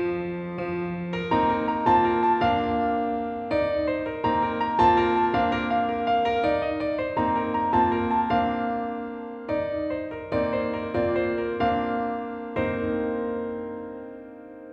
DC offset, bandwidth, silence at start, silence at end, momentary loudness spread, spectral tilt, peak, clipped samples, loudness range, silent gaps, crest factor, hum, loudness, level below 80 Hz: under 0.1%; 7.2 kHz; 0 s; 0 s; 11 LU; -8 dB/octave; -8 dBFS; under 0.1%; 4 LU; none; 18 dB; none; -25 LUFS; -48 dBFS